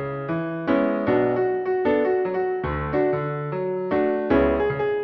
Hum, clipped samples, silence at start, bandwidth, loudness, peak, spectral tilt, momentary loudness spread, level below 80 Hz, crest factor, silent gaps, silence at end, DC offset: none; under 0.1%; 0 s; 5.4 kHz; -23 LUFS; -6 dBFS; -10 dB/octave; 6 LU; -42 dBFS; 16 dB; none; 0 s; under 0.1%